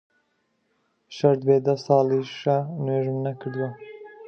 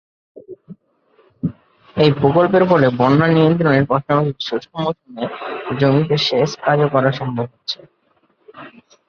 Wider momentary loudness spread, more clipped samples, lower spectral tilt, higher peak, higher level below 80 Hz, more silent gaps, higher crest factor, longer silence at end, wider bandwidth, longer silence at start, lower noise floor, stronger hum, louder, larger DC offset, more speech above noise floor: about the same, 12 LU vs 13 LU; neither; about the same, -8 dB/octave vs -7 dB/octave; second, -4 dBFS vs 0 dBFS; second, -72 dBFS vs -52 dBFS; neither; about the same, 20 dB vs 18 dB; second, 0 s vs 0.4 s; about the same, 6.8 kHz vs 6.8 kHz; first, 1.1 s vs 0.35 s; first, -71 dBFS vs -60 dBFS; neither; second, -23 LUFS vs -17 LUFS; neither; first, 49 dB vs 45 dB